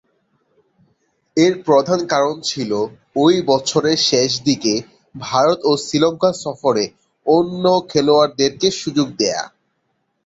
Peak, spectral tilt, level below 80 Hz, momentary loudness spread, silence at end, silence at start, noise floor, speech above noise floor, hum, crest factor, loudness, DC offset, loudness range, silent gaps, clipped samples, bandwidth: -2 dBFS; -4 dB/octave; -58 dBFS; 8 LU; 0.8 s; 1.35 s; -69 dBFS; 52 dB; none; 16 dB; -17 LUFS; under 0.1%; 2 LU; none; under 0.1%; 8 kHz